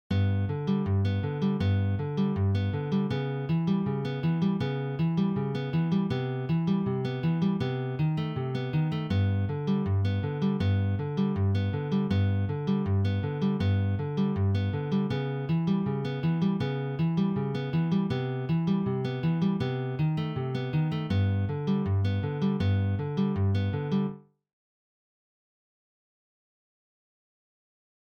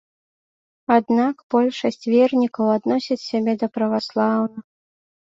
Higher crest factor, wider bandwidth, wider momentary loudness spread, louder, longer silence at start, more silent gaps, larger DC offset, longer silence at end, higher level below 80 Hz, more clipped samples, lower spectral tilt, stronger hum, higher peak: about the same, 12 dB vs 16 dB; second, 6.4 kHz vs 7.6 kHz; second, 3 LU vs 7 LU; second, -28 LUFS vs -20 LUFS; second, 0.1 s vs 0.9 s; second, none vs 1.43-1.50 s; neither; first, 3.85 s vs 0.8 s; first, -58 dBFS vs -66 dBFS; neither; first, -9.5 dB/octave vs -6.5 dB/octave; neither; second, -16 dBFS vs -4 dBFS